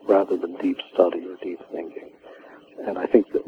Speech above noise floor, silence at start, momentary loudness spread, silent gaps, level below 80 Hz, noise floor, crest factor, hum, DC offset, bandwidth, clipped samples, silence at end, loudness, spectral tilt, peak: 23 dB; 0.05 s; 19 LU; none; -66 dBFS; -46 dBFS; 22 dB; none; under 0.1%; 5.4 kHz; under 0.1%; 0 s; -24 LUFS; -7 dB/octave; -2 dBFS